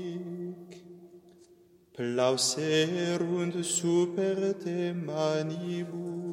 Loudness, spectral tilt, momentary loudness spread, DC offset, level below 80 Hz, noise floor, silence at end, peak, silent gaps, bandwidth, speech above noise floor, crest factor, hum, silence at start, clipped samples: -30 LUFS; -4.5 dB/octave; 14 LU; under 0.1%; -78 dBFS; -60 dBFS; 0 s; -12 dBFS; none; 16.5 kHz; 31 dB; 18 dB; none; 0 s; under 0.1%